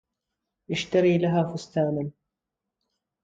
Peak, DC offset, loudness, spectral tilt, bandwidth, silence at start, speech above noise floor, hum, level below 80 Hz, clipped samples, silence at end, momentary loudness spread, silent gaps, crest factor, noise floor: -10 dBFS; under 0.1%; -25 LUFS; -6.5 dB/octave; 7.8 kHz; 0.7 s; 62 dB; none; -62 dBFS; under 0.1%; 1.15 s; 11 LU; none; 18 dB; -86 dBFS